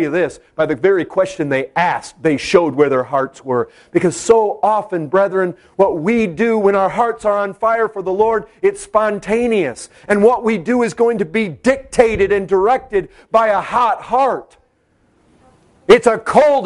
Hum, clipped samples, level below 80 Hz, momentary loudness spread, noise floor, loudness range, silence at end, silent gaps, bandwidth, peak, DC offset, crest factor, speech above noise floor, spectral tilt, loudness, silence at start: none; under 0.1%; -46 dBFS; 7 LU; -58 dBFS; 1 LU; 0 s; none; 11.5 kHz; 0 dBFS; under 0.1%; 16 dB; 43 dB; -5.5 dB/octave; -16 LUFS; 0 s